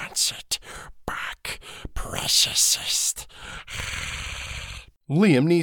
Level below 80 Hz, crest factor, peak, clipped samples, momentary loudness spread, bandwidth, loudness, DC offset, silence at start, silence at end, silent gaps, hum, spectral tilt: -42 dBFS; 18 dB; -6 dBFS; under 0.1%; 19 LU; 19 kHz; -23 LUFS; under 0.1%; 0 s; 0 s; none; none; -3 dB/octave